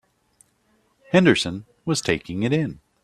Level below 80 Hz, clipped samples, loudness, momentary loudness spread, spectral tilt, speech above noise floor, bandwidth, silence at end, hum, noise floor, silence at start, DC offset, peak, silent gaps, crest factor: -54 dBFS; under 0.1%; -22 LUFS; 12 LU; -5 dB/octave; 44 dB; 13 kHz; 0.3 s; none; -65 dBFS; 1.1 s; under 0.1%; -2 dBFS; none; 22 dB